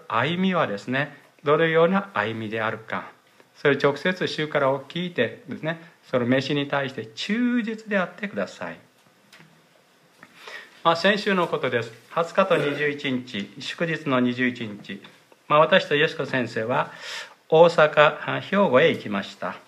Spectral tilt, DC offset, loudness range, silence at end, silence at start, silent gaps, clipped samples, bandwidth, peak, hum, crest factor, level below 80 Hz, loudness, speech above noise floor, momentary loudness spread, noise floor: -6 dB/octave; under 0.1%; 7 LU; 0.1 s; 0.1 s; none; under 0.1%; 12.5 kHz; -2 dBFS; none; 22 dB; -72 dBFS; -23 LUFS; 35 dB; 14 LU; -58 dBFS